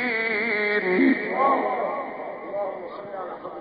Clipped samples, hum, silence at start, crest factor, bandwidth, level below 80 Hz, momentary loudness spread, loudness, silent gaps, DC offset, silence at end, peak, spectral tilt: under 0.1%; none; 0 s; 16 dB; 5 kHz; -70 dBFS; 14 LU; -24 LUFS; none; under 0.1%; 0 s; -8 dBFS; -3 dB/octave